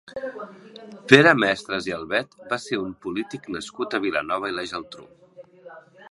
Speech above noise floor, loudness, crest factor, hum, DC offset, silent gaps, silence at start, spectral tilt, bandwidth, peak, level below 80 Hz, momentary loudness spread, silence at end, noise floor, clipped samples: 23 dB; -22 LUFS; 24 dB; none; under 0.1%; none; 0.1 s; -5 dB/octave; 11.5 kHz; 0 dBFS; -62 dBFS; 24 LU; 0.05 s; -47 dBFS; under 0.1%